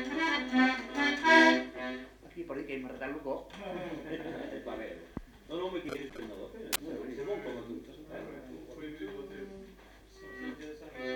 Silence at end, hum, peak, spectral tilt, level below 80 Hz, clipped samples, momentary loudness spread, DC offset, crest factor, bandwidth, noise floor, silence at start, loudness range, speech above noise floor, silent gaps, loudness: 0 s; none; -10 dBFS; -3.5 dB/octave; -60 dBFS; under 0.1%; 19 LU; under 0.1%; 24 dB; 19 kHz; -55 dBFS; 0 s; 15 LU; 15 dB; none; -32 LUFS